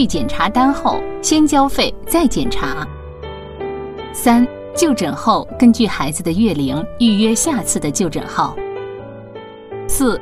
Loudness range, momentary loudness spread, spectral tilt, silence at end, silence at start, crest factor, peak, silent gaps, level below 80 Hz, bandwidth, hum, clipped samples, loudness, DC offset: 3 LU; 17 LU; -4 dB/octave; 0 s; 0 s; 16 dB; 0 dBFS; none; -34 dBFS; 15.5 kHz; none; under 0.1%; -16 LUFS; under 0.1%